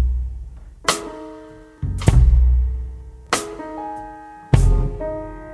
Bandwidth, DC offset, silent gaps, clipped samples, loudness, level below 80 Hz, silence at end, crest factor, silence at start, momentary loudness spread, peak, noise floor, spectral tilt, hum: 11 kHz; under 0.1%; none; under 0.1%; -21 LUFS; -20 dBFS; 0 s; 18 dB; 0 s; 21 LU; 0 dBFS; -41 dBFS; -5.5 dB/octave; none